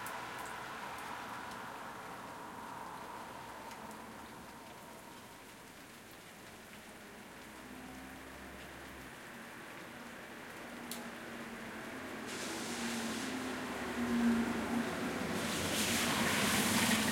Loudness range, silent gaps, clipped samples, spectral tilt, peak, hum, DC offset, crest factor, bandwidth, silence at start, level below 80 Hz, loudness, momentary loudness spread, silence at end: 16 LU; none; under 0.1%; -3 dB/octave; -18 dBFS; none; under 0.1%; 22 dB; 16.5 kHz; 0 s; -66 dBFS; -39 LUFS; 19 LU; 0 s